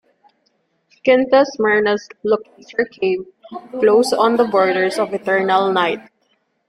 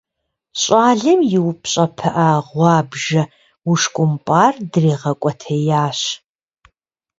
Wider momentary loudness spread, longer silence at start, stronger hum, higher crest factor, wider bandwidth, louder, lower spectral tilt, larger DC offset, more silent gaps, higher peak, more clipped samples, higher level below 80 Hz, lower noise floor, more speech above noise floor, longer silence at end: first, 11 LU vs 8 LU; first, 1.05 s vs 0.55 s; neither; about the same, 16 dB vs 16 dB; first, 13.5 kHz vs 7.8 kHz; about the same, -17 LUFS vs -16 LUFS; about the same, -4.5 dB/octave vs -5 dB/octave; neither; neither; about the same, -2 dBFS vs 0 dBFS; neither; about the same, -62 dBFS vs -58 dBFS; second, -65 dBFS vs -77 dBFS; second, 49 dB vs 61 dB; second, 0.7 s vs 1.05 s